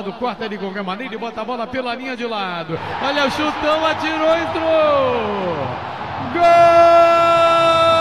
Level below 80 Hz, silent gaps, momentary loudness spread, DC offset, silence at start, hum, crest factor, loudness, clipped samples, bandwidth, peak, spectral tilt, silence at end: -50 dBFS; none; 15 LU; 0.4%; 0 s; none; 14 dB; -16 LUFS; under 0.1%; 11 kHz; -2 dBFS; -5 dB/octave; 0 s